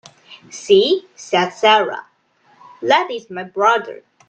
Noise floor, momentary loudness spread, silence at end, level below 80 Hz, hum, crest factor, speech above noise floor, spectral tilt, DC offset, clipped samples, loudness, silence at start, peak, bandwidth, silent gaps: -53 dBFS; 18 LU; 0.35 s; -68 dBFS; none; 18 dB; 36 dB; -3.5 dB/octave; under 0.1%; under 0.1%; -16 LUFS; 0.3 s; 0 dBFS; 8.8 kHz; none